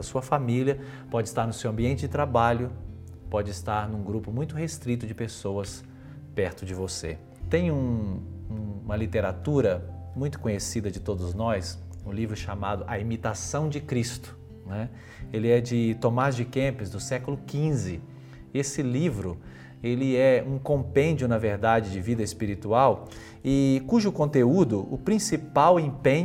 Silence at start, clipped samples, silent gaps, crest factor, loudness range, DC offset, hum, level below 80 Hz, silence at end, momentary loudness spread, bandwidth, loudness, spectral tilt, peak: 0 s; under 0.1%; none; 20 dB; 7 LU; under 0.1%; none; -50 dBFS; 0 s; 14 LU; 16 kHz; -27 LUFS; -6.5 dB/octave; -8 dBFS